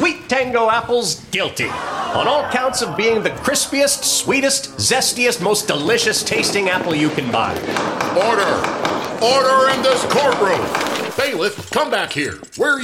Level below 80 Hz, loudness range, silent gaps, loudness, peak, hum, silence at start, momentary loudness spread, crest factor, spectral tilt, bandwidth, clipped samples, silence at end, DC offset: -52 dBFS; 2 LU; none; -17 LUFS; -4 dBFS; none; 0 s; 6 LU; 14 dB; -2.5 dB/octave; 16.5 kHz; under 0.1%; 0 s; under 0.1%